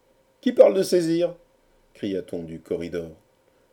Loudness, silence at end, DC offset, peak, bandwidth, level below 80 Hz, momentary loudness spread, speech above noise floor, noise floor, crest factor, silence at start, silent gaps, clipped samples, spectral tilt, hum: -23 LUFS; 0.6 s; under 0.1%; -2 dBFS; 17.5 kHz; -62 dBFS; 17 LU; 39 dB; -61 dBFS; 22 dB; 0.45 s; none; under 0.1%; -6 dB/octave; none